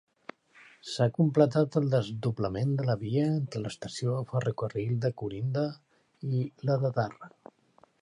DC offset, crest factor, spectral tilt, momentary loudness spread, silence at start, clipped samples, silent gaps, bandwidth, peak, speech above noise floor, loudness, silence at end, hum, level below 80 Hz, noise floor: under 0.1%; 22 dB; -7.5 dB/octave; 14 LU; 0.85 s; under 0.1%; none; 11 kHz; -8 dBFS; 29 dB; -30 LUFS; 0.75 s; none; -62 dBFS; -58 dBFS